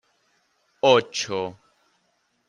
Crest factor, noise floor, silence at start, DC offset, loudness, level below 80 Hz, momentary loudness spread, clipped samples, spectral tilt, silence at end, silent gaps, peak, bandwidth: 22 dB; -70 dBFS; 0.85 s; under 0.1%; -22 LUFS; -72 dBFS; 12 LU; under 0.1%; -3.5 dB/octave; 0.95 s; none; -4 dBFS; 10.5 kHz